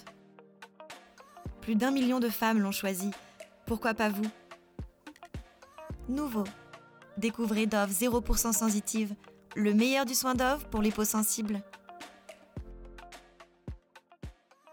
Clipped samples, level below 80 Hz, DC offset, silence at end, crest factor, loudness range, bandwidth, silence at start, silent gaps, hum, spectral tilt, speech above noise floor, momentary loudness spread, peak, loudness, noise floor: under 0.1%; -46 dBFS; under 0.1%; 0.4 s; 18 dB; 8 LU; over 20 kHz; 0 s; none; none; -4 dB/octave; 28 dB; 22 LU; -16 dBFS; -30 LUFS; -58 dBFS